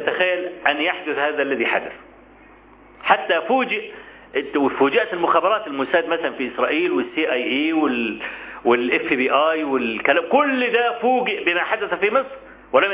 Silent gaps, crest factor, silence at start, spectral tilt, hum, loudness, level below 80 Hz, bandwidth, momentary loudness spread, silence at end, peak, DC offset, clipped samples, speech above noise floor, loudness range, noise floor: none; 18 dB; 0 s; -7.5 dB/octave; none; -20 LUFS; -60 dBFS; 4 kHz; 7 LU; 0 s; -2 dBFS; under 0.1%; under 0.1%; 27 dB; 3 LU; -47 dBFS